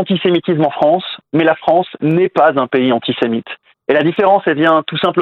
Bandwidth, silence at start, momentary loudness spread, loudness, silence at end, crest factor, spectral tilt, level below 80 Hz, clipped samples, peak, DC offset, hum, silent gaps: 5.4 kHz; 0 s; 6 LU; -14 LUFS; 0 s; 14 dB; -8.5 dB/octave; -62 dBFS; under 0.1%; 0 dBFS; under 0.1%; none; none